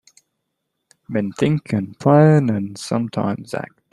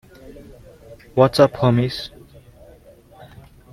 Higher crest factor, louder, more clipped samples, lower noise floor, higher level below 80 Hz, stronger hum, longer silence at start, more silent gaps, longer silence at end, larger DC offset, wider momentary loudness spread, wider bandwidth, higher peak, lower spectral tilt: about the same, 18 dB vs 22 dB; about the same, -19 LUFS vs -18 LUFS; neither; first, -76 dBFS vs -47 dBFS; second, -58 dBFS vs -48 dBFS; neither; first, 1.1 s vs 0.25 s; neither; second, 0.3 s vs 1.65 s; neither; about the same, 14 LU vs 15 LU; second, 11.5 kHz vs 15 kHz; about the same, -2 dBFS vs 0 dBFS; about the same, -7.5 dB/octave vs -7 dB/octave